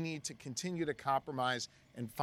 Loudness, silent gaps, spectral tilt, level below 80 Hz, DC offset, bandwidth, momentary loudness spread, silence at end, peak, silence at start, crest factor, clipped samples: -38 LUFS; none; -4 dB/octave; -72 dBFS; under 0.1%; 16.5 kHz; 10 LU; 0 s; -20 dBFS; 0 s; 18 dB; under 0.1%